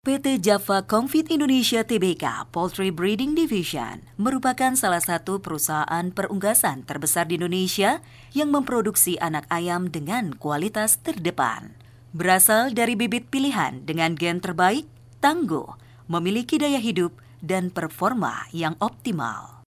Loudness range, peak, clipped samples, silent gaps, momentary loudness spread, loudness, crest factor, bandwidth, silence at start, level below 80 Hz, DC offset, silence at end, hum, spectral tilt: 4 LU; -2 dBFS; under 0.1%; none; 8 LU; -23 LUFS; 20 dB; 16 kHz; 0.05 s; -58 dBFS; under 0.1%; 0.2 s; none; -3.5 dB/octave